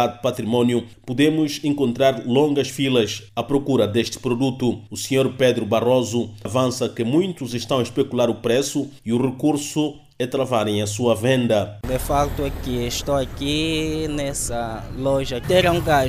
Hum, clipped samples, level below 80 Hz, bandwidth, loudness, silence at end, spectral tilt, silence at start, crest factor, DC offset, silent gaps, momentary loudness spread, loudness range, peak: none; under 0.1%; -40 dBFS; 16 kHz; -21 LUFS; 0 s; -5 dB/octave; 0 s; 16 dB; under 0.1%; none; 7 LU; 2 LU; -4 dBFS